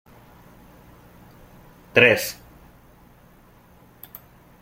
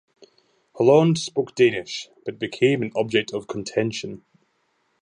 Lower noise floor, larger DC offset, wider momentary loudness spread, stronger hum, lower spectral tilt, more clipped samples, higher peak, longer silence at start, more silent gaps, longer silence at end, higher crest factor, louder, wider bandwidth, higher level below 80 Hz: second, -52 dBFS vs -69 dBFS; neither; first, 27 LU vs 15 LU; neither; second, -3.5 dB/octave vs -5.5 dB/octave; neither; about the same, -2 dBFS vs -4 dBFS; first, 1.95 s vs 0.75 s; neither; first, 2.3 s vs 0.9 s; first, 26 dB vs 18 dB; first, -18 LUFS vs -22 LUFS; first, 16.5 kHz vs 10 kHz; first, -56 dBFS vs -66 dBFS